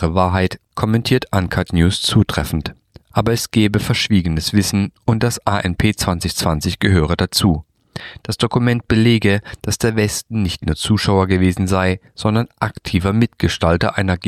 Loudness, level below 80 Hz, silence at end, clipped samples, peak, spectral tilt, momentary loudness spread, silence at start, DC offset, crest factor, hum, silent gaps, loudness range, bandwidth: -17 LUFS; -34 dBFS; 0 s; under 0.1%; -2 dBFS; -5.5 dB/octave; 7 LU; 0 s; under 0.1%; 16 dB; none; none; 1 LU; 15 kHz